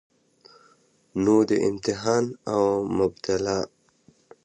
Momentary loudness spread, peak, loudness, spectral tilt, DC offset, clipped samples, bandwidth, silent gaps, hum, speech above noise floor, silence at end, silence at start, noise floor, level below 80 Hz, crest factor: 8 LU; -8 dBFS; -24 LUFS; -5.5 dB/octave; under 0.1%; under 0.1%; 9.6 kHz; none; none; 38 dB; 0.8 s; 1.15 s; -61 dBFS; -56 dBFS; 18 dB